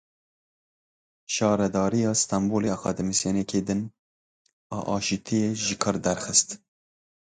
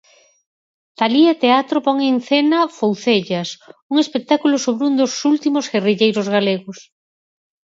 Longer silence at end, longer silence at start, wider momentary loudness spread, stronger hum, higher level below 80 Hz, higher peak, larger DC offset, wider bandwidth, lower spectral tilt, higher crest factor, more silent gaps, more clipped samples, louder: about the same, 0.8 s vs 0.9 s; first, 1.3 s vs 1 s; about the same, 9 LU vs 7 LU; neither; first, -56 dBFS vs -70 dBFS; second, -6 dBFS vs 0 dBFS; neither; first, 9.6 kHz vs 7.8 kHz; about the same, -4 dB/octave vs -4.5 dB/octave; about the same, 22 dB vs 18 dB; first, 3.99-4.45 s, 4.53-4.70 s vs 3.82-3.89 s; neither; second, -25 LUFS vs -17 LUFS